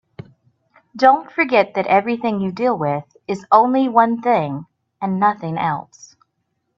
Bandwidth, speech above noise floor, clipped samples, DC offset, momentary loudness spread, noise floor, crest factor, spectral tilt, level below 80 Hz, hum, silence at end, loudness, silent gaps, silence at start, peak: 7.6 kHz; 55 dB; under 0.1%; under 0.1%; 12 LU; -72 dBFS; 18 dB; -7 dB/octave; -64 dBFS; none; 0.95 s; -18 LUFS; none; 0.95 s; 0 dBFS